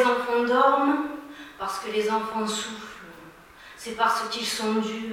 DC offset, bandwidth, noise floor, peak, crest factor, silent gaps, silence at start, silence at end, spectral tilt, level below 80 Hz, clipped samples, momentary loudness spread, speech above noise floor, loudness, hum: under 0.1%; 16.5 kHz; -48 dBFS; -6 dBFS; 20 dB; none; 0 s; 0 s; -3 dB/octave; -62 dBFS; under 0.1%; 20 LU; 23 dB; -25 LUFS; none